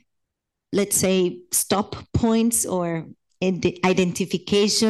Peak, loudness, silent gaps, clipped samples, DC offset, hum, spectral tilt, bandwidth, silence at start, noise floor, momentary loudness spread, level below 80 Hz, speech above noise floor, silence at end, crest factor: -6 dBFS; -22 LUFS; none; under 0.1%; under 0.1%; none; -4 dB/octave; 13 kHz; 0.7 s; -81 dBFS; 8 LU; -48 dBFS; 60 dB; 0 s; 18 dB